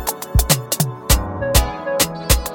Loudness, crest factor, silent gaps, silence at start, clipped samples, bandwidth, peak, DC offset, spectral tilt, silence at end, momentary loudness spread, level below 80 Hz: -18 LUFS; 18 dB; none; 0 s; under 0.1%; 17.5 kHz; 0 dBFS; under 0.1%; -3.5 dB/octave; 0 s; 4 LU; -22 dBFS